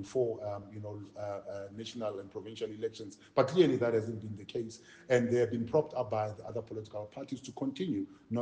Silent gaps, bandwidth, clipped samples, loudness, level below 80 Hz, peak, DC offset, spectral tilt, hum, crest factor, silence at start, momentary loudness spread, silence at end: none; 9.4 kHz; under 0.1%; -35 LUFS; -70 dBFS; -12 dBFS; under 0.1%; -6.5 dB/octave; none; 22 dB; 0 s; 15 LU; 0 s